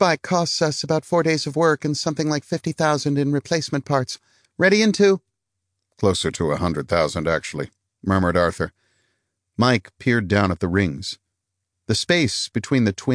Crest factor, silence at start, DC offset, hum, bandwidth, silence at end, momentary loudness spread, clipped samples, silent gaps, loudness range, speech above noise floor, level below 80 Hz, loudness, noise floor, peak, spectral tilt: 18 dB; 0 s; under 0.1%; none; 10.5 kHz; 0 s; 11 LU; under 0.1%; none; 3 LU; 59 dB; -50 dBFS; -21 LUFS; -79 dBFS; -4 dBFS; -5 dB/octave